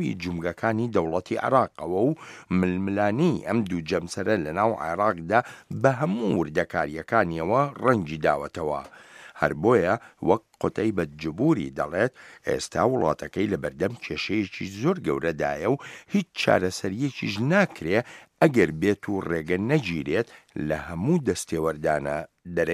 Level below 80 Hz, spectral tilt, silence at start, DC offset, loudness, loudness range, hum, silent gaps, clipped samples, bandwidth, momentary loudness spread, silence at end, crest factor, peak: -54 dBFS; -6.5 dB/octave; 0 s; under 0.1%; -25 LUFS; 2 LU; none; none; under 0.1%; 15 kHz; 8 LU; 0 s; 22 dB; -4 dBFS